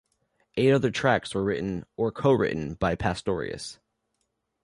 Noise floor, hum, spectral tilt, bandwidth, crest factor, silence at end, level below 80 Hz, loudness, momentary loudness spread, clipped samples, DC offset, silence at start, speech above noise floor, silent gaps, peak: -77 dBFS; none; -6 dB/octave; 11.5 kHz; 18 dB; 0.9 s; -50 dBFS; -26 LUFS; 11 LU; under 0.1%; under 0.1%; 0.55 s; 52 dB; none; -8 dBFS